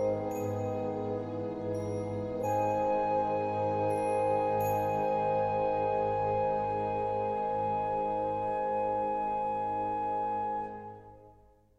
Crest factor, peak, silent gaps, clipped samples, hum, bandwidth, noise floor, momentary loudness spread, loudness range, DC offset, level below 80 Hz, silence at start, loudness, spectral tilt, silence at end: 14 dB; -18 dBFS; none; under 0.1%; none; 13.5 kHz; -60 dBFS; 6 LU; 3 LU; under 0.1%; -58 dBFS; 0 s; -31 LUFS; -7.5 dB/octave; 0.45 s